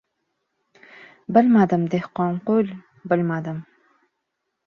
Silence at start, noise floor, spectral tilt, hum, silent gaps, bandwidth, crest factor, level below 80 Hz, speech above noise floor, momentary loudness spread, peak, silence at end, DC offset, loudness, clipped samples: 1 s; -78 dBFS; -9.5 dB/octave; none; none; 6.6 kHz; 20 dB; -66 dBFS; 58 dB; 17 LU; -2 dBFS; 1.05 s; under 0.1%; -21 LUFS; under 0.1%